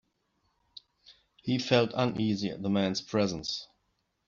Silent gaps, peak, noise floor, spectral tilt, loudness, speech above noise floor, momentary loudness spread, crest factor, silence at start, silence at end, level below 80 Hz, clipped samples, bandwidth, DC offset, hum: none; -10 dBFS; -77 dBFS; -5.5 dB/octave; -30 LUFS; 48 dB; 11 LU; 22 dB; 1.1 s; 0.6 s; -64 dBFS; under 0.1%; 7.4 kHz; under 0.1%; none